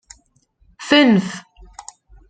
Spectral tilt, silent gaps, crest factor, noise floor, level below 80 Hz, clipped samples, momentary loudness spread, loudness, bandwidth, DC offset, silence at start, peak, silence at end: -5 dB/octave; none; 18 dB; -59 dBFS; -52 dBFS; under 0.1%; 26 LU; -14 LUFS; 9.4 kHz; under 0.1%; 0.8 s; -2 dBFS; 0.9 s